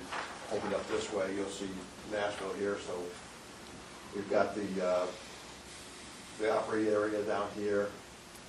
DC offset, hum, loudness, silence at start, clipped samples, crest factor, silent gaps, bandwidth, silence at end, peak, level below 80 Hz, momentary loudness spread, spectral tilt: under 0.1%; none; -35 LUFS; 0 s; under 0.1%; 20 dB; none; 12.5 kHz; 0 s; -16 dBFS; -64 dBFS; 16 LU; -4.5 dB/octave